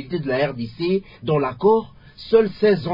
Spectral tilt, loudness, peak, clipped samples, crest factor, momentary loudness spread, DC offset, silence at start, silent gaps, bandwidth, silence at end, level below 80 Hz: -9 dB/octave; -20 LUFS; -4 dBFS; under 0.1%; 16 dB; 7 LU; under 0.1%; 0 s; none; 5.4 kHz; 0 s; -52 dBFS